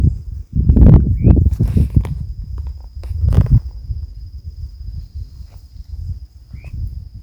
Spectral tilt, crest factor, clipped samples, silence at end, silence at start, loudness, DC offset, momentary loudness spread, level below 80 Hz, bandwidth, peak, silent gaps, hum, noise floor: -10.5 dB/octave; 16 dB; 0.2%; 0.05 s; 0 s; -14 LUFS; under 0.1%; 22 LU; -20 dBFS; 5.6 kHz; 0 dBFS; none; none; -35 dBFS